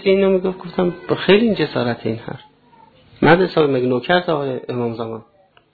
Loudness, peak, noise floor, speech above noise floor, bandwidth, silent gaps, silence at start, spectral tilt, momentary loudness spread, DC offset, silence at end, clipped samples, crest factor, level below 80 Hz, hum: -18 LUFS; 0 dBFS; -50 dBFS; 33 dB; 4.8 kHz; none; 0 s; -9.5 dB/octave; 14 LU; under 0.1%; 0.5 s; under 0.1%; 18 dB; -50 dBFS; none